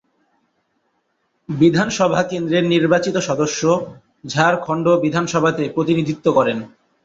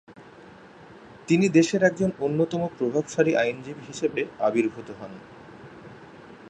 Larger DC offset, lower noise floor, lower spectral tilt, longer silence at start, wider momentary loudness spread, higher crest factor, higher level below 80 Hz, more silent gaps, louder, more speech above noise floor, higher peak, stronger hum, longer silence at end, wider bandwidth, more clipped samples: neither; first, -68 dBFS vs -48 dBFS; about the same, -5.5 dB/octave vs -6 dB/octave; first, 1.5 s vs 0.1 s; second, 6 LU vs 25 LU; about the same, 16 dB vs 20 dB; first, -56 dBFS vs -64 dBFS; neither; first, -18 LUFS vs -24 LUFS; first, 51 dB vs 24 dB; first, -2 dBFS vs -6 dBFS; neither; first, 0.4 s vs 0 s; second, 7.8 kHz vs 10 kHz; neither